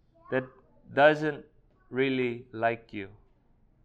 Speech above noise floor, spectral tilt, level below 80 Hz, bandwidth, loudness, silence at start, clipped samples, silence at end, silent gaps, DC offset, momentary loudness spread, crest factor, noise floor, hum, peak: 36 dB; -7 dB/octave; -64 dBFS; 8.4 kHz; -28 LUFS; 0.3 s; under 0.1%; 0.75 s; none; under 0.1%; 19 LU; 22 dB; -64 dBFS; none; -8 dBFS